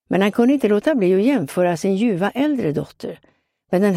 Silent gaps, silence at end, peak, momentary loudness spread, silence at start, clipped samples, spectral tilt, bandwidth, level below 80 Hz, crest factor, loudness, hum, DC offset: none; 0 s; -4 dBFS; 10 LU; 0.1 s; under 0.1%; -7 dB/octave; 15.5 kHz; -60 dBFS; 16 dB; -18 LUFS; none; under 0.1%